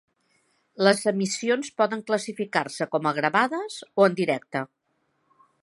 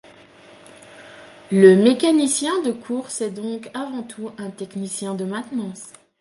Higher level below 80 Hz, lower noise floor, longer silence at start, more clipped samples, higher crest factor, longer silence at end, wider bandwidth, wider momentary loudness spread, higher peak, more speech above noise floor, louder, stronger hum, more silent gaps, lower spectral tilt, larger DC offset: second, -78 dBFS vs -70 dBFS; first, -72 dBFS vs -47 dBFS; second, 0.8 s vs 0.95 s; neither; about the same, 22 dB vs 20 dB; first, 1 s vs 0.3 s; about the same, 11.5 kHz vs 11.5 kHz; second, 10 LU vs 19 LU; about the same, -2 dBFS vs -2 dBFS; first, 48 dB vs 27 dB; second, -25 LUFS vs -20 LUFS; neither; neither; about the same, -4.5 dB/octave vs -5 dB/octave; neither